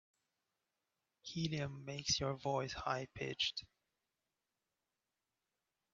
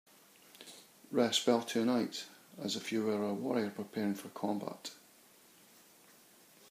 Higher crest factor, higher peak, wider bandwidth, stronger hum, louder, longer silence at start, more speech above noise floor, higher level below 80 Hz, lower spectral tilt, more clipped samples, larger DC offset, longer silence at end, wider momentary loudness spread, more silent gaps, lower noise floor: about the same, 22 dB vs 22 dB; second, -22 dBFS vs -16 dBFS; second, 7.8 kHz vs 15.5 kHz; neither; second, -40 LUFS vs -35 LUFS; first, 1.25 s vs 0.6 s; first, over 49 dB vs 28 dB; first, -68 dBFS vs -86 dBFS; about the same, -3.5 dB/octave vs -4 dB/octave; neither; neither; first, 2.3 s vs 1.75 s; second, 10 LU vs 21 LU; neither; first, under -90 dBFS vs -63 dBFS